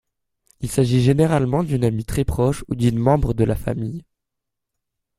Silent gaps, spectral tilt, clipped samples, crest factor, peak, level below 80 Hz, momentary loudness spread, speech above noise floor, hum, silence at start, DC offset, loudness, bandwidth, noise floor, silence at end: none; -7.5 dB/octave; under 0.1%; 18 dB; -2 dBFS; -36 dBFS; 10 LU; 61 dB; none; 0.6 s; under 0.1%; -20 LUFS; 15.5 kHz; -80 dBFS; 1.15 s